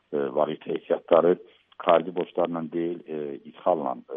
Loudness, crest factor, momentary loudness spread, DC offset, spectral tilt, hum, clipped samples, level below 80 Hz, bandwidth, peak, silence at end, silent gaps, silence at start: -26 LUFS; 22 dB; 12 LU; under 0.1%; -5 dB/octave; none; under 0.1%; -74 dBFS; 3.9 kHz; -4 dBFS; 0 s; none; 0.1 s